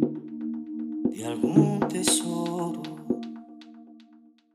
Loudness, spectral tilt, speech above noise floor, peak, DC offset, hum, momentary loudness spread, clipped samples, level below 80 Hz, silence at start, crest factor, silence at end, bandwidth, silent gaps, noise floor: -27 LUFS; -4.5 dB/octave; 31 dB; -6 dBFS; under 0.1%; none; 20 LU; under 0.1%; -66 dBFS; 0 s; 22 dB; 0.5 s; 15.5 kHz; none; -56 dBFS